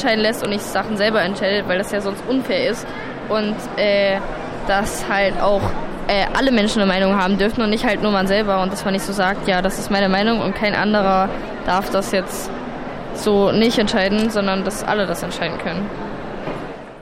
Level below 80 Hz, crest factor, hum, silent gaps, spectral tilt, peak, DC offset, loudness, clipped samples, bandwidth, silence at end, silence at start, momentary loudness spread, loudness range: -36 dBFS; 16 dB; none; none; -5 dB/octave; -2 dBFS; under 0.1%; -19 LUFS; under 0.1%; 16 kHz; 0 s; 0 s; 11 LU; 3 LU